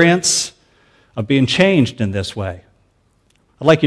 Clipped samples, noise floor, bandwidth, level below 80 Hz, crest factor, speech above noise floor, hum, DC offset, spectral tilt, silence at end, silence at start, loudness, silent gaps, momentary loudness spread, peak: under 0.1%; -59 dBFS; 11 kHz; -50 dBFS; 16 dB; 43 dB; none; under 0.1%; -4.5 dB/octave; 0 s; 0 s; -16 LUFS; none; 15 LU; 0 dBFS